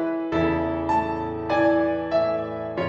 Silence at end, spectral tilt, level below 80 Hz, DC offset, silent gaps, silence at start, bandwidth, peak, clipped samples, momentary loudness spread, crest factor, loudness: 0 s; -8 dB/octave; -46 dBFS; under 0.1%; none; 0 s; 7.6 kHz; -10 dBFS; under 0.1%; 7 LU; 14 dB; -24 LUFS